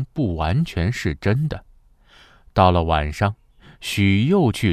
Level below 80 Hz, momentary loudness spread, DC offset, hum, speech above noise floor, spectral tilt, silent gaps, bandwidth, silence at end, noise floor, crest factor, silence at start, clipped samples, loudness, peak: -32 dBFS; 10 LU; under 0.1%; none; 32 dB; -6.5 dB/octave; none; 14 kHz; 0 s; -52 dBFS; 18 dB; 0 s; under 0.1%; -20 LUFS; -2 dBFS